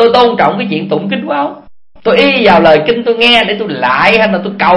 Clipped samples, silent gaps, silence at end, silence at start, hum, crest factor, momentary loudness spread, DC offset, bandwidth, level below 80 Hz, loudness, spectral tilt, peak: 0.5%; none; 0 s; 0 s; none; 10 dB; 9 LU; under 0.1%; 11 kHz; -42 dBFS; -9 LUFS; -6 dB/octave; 0 dBFS